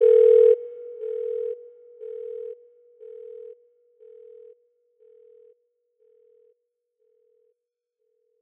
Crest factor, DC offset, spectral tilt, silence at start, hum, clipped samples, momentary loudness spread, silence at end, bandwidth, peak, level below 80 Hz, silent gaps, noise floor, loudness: 18 dB; under 0.1%; -6.5 dB/octave; 0 s; none; under 0.1%; 28 LU; 5.85 s; 3.5 kHz; -8 dBFS; -84 dBFS; none; -82 dBFS; -21 LUFS